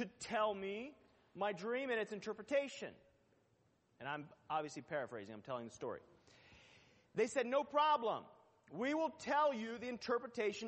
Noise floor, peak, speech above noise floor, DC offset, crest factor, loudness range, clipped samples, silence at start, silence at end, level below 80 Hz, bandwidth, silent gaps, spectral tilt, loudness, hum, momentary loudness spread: -77 dBFS; -22 dBFS; 36 dB; under 0.1%; 18 dB; 9 LU; under 0.1%; 0 s; 0 s; -82 dBFS; 8.4 kHz; none; -4 dB/octave; -41 LUFS; none; 13 LU